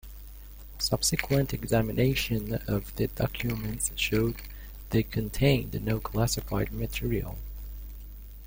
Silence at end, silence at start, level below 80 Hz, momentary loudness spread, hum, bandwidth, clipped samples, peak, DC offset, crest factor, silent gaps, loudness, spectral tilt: 0 s; 0.05 s; -40 dBFS; 19 LU; 50 Hz at -40 dBFS; 17 kHz; under 0.1%; -8 dBFS; under 0.1%; 22 dB; none; -29 LUFS; -5 dB/octave